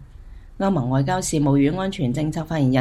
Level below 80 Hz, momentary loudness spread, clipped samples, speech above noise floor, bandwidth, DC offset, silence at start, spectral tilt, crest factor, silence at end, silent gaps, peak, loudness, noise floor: -42 dBFS; 6 LU; under 0.1%; 20 dB; 13 kHz; under 0.1%; 0 s; -6.5 dB/octave; 14 dB; 0 s; none; -6 dBFS; -21 LUFS; -41 dBFS